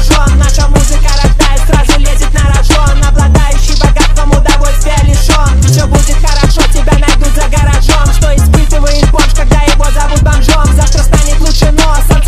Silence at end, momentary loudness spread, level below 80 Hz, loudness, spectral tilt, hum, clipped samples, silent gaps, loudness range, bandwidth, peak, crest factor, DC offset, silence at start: 0 s; 3 LU; -6 dBFS; -9 LUFS; -4.5 dB/octave; none; 0.3%; none; 0 LU; 14.5 kHz; 0 dBFS; 6 dB; under 0.1%; 0 s